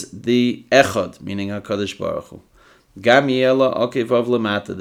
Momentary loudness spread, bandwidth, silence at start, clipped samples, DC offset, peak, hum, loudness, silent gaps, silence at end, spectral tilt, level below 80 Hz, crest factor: 11 LU; 15 kHz; 0 s; under 0.1%; under 0.1%; 0 dBFS; none; -18 LUFS; none; 0 s; -5 dB/octave; -58 dBFS; 18 dB